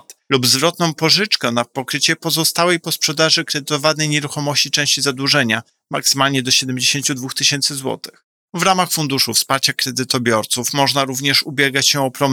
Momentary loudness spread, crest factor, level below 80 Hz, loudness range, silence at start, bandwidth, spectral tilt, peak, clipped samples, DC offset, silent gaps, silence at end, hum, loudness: 6 LU; 16 dB; -66 dBFS; 1 LU; 0.1 s; 20 kHz; -2.5 dB/octave; -2 dBFS; under 0.1%; under 0.1%; 8.24-8.48 s; 0 s; none; -16 LUFS